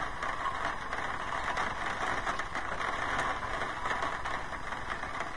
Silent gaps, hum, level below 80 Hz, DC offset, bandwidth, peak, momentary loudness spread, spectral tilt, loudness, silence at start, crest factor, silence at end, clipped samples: none; none; -48 dBFS; 0.7%; 10.5 kHz; -16 dBFS; 5 LU; -3.5 dB/octave; -34 LUFS; 0 s; 18 dB; 0 s; under 0.1%